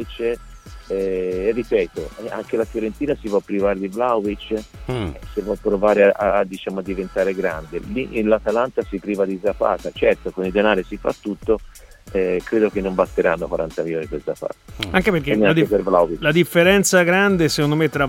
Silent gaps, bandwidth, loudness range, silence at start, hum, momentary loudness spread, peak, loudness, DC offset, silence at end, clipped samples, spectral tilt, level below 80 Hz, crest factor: none; 16.5 kHz; 6 LU; 0 s; none; 12 LU; 0 dBFS; -20 LUFS; under 0.1%; 0 s; under 0.1%; -5 dB/octave; -40 dBFS; 18 dB